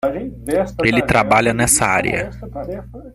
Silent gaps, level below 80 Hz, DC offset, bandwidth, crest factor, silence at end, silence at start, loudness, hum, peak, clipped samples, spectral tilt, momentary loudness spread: none; -36 dBFS; under 0.1%; 16 kHz; 16 dB; 0.05 s; 0.05 s; -16 LUFS; none; 0 dBFS; under 0.1%; -4 dB/octave; 15 LU